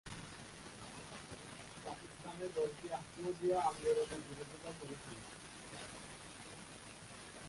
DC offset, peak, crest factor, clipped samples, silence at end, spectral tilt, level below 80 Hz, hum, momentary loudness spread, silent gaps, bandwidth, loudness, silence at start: under 0.1%; -24 dBFS; 20 dB; under 0.1%; 0 s; -4 dB/octave; -68 dBFS; none; 15 LU; none; 11.5 kHz; -44 LUFS; 0.05 s